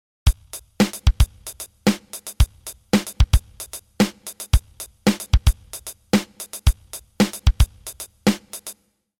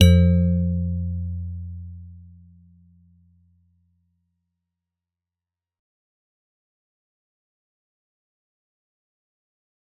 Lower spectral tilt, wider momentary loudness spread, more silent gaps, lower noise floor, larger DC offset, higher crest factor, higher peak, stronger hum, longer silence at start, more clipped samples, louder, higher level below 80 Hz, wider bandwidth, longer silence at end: second, -5 dB/octave vs -8 dB/octave; second, 15 LU vs 24 LU; neither; second, -44 dBFS vs under -90 dBFS; neither; second, 18 dB vs 24 dB; about the same, -4 dBFS vs -2 dBFS; neither; first, 0.25 s vs 0 s; neither; about the same, -22 LUFS vs -22 LUFS; first, -24 dBFS vs -44 dBFS; first, 19 kHz vs 4.2 kHz; second, 0.5 s vs 7.8 s